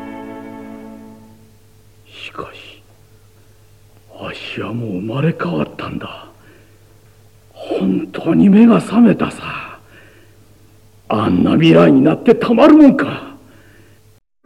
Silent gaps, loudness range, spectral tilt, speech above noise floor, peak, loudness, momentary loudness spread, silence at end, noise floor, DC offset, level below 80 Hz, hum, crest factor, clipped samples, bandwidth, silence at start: none; 22 LU; -8 dB/octave; 39 dB; 0 dBFS; -13 LUFS; 24 LU; 1.15 s; -51 dBFS; 0.2%; -50 dBFS; none; 16 dB; under 0.1%; 11.5 kHz; 0 s